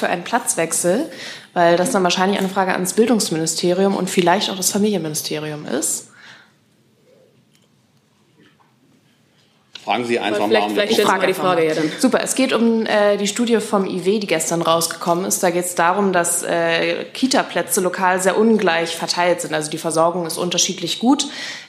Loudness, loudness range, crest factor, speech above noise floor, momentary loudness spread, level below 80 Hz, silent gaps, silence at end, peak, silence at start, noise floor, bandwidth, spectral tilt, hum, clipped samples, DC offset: -18 LUFS; 8 LU; 18 dB; 40 dB; 6 LU; -72 dBFS; none; 0 s; -2 dBFS; 0 s; -58 dBFS; 15.5 kHz; -3.5 dB/octave; none; under 0.1%; under 0.1%